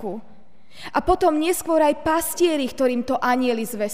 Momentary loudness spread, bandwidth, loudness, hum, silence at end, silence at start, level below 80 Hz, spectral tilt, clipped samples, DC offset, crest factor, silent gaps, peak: 7 LU; 16 kHz; -21 LUFS; none; 0 s; 0 s; -46 dBFS; -3.5 dB/octave; under 0.1%; 1%; 16 dB; none; -4 dBFS